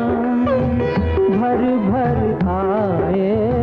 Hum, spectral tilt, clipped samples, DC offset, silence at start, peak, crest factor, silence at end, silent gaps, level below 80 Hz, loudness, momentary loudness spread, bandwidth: none; -10.5 dB/octave; under 0.1%; under 0.1%; 0 s; -6 dBFS; 10 dB; 0 s; none; -36 dBFS; -18 LUFS; 2 LU; 5.6 kHz